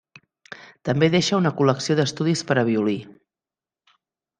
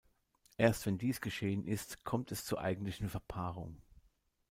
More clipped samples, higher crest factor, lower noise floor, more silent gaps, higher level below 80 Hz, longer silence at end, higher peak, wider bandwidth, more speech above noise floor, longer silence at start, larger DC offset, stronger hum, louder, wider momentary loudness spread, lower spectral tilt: neither; about the same, 20 dB vs 22 dB; first, under -90 dBFS vs -74 dBFS; neither; about the same, -62 dBFS vs -60 dBFS; first, 1.3 s vs 0.5 s; first, -2 dBFS vs -16 dBFS; second, 9.8 kHz vs 16.5 kHz; first, over 70 dB vs 37 dB; about the same, 0.5 s vs 0.6 s; neither; neither; first, -21 LUFS vs -38 LUFS; first, 16 LU vs 10 LU; about the same, -5.5 dB/octave vs -5.5 dB/octave